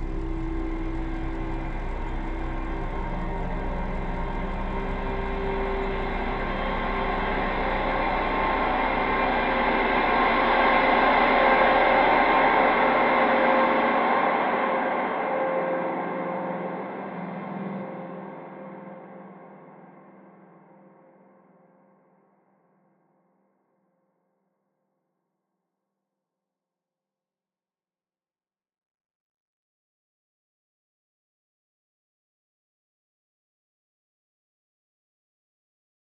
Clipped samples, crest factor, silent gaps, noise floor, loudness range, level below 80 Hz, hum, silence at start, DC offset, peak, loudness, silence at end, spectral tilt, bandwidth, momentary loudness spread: under 0.1%; 20 dB; none; under -90 dBFS; 16 LU; -36 dBFS; none; 0 s; under 0.1%; -8 dBFS; -24 LUFS; 16.15 s; -7.5 dB/octave; 5.6 kHz; 15 LU